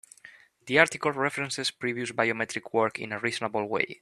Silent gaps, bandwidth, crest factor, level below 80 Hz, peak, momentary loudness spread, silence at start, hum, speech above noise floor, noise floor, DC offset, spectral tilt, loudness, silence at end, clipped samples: none; 13 kHz; 24 dB; -70 dBFS; -4 dBFS; 8 LU; 0.25 s; none; 26 dB; -54 dBFS; under 0.1%; -3.5 dB/octave; -27 LUFS; 0.05 s; under 0.1%